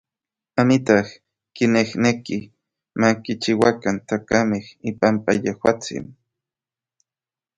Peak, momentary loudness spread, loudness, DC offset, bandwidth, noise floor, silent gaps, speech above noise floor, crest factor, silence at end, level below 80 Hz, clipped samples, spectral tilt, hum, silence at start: 0 dBFS; 12 LU; -20 LUFS; under 0.1%; 11 kHz; under -90 dBFS; none; over 70 dB; 22 dB; 1.45 s; -56 dBFS; under 0.1%; -5.5 dB/octave; none; 0.55 s